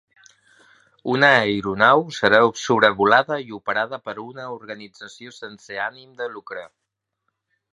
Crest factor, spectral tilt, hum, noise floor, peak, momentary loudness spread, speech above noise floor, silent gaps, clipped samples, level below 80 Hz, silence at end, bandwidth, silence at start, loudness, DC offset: 22 dB; -4.5 dB/octave; none; -77 dBFS; 0 dBFS; 21 LU; 56 dB; none; under 0.1%; -62 dBFS; 1.05 s; 11 kHz; 1.05 s; -18 LUFS; under 0.1%